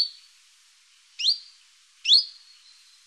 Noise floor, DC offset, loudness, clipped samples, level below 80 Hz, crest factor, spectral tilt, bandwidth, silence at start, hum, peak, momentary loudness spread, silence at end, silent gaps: -58 dBFS; under 0.1%; -21 LUFS; under 0.1%; -84 dBFS; 22 dB; 5 dB/octave; 12 kHz; 0 s; none; -6 dBFS; 12 LU; 0.75 s; none